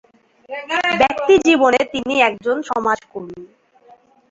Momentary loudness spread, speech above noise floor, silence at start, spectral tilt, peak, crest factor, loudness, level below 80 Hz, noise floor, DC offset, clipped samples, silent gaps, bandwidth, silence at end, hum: 19 LU; 33 dB; 0.5 s; -3.5 dB/octave; 0 dBFS; 18 dB; -16 LUFS; -54 dBFS; -50 dBFS; under 0.1%; under 0.1%; none; 7.8 kHz; 0.85 s; none